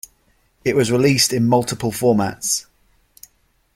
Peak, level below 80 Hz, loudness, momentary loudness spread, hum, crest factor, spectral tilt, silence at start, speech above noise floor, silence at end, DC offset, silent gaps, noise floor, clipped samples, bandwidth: -2 dBFS; -52 dBFS; -18 LUFS; 8 LU; none; 18 dB; -4 dB/octave; 0.65 s; 43 dB; 1.15 s; under 0.1%; none; -61 dBFS; under 0.1%; 16.5 kHz